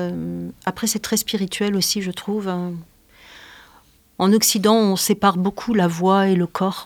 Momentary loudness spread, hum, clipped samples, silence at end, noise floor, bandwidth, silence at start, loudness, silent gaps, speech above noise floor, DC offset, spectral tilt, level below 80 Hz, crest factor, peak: 11 LU; none; under 0.1%; 0 s; -53 dBFS; 19.5 kHz; 0 s; -20 LUFS; none; 33 dB; under 0.1%; -4.5 dB/octave; -56 dBFS; 18 dB; -2 dBFS